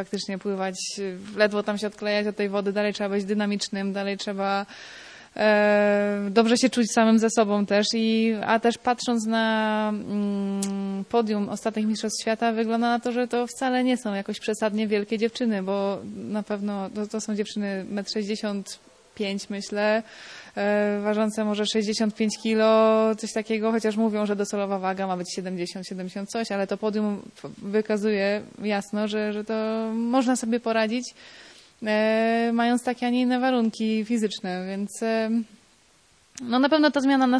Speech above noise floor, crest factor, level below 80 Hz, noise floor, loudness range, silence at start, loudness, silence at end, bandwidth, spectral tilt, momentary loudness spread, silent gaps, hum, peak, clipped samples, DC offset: 35 dB; 18 dB; -68 dBFS; -60 dBFS; 6 LU; 0 s; -25 LUFS; 0 s; 11 kHz; -4.5 dB/octave; 11 LU; none; none; -6 dBFS; under 0.1%; under 0.1%